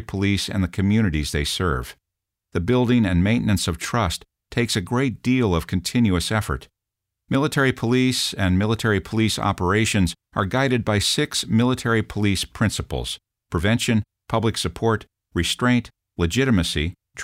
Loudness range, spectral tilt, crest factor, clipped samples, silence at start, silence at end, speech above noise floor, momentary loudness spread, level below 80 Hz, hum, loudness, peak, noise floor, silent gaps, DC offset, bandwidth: 2 LU; -5 dB/octave; 14 dB; under 0.1%; 0 s; 0 s; 63 dB; 8 LU; -38 dBFS; none; -22 LUFS; -6 dBFS; -84 dBFS; none; under 0.1%; 16 kHz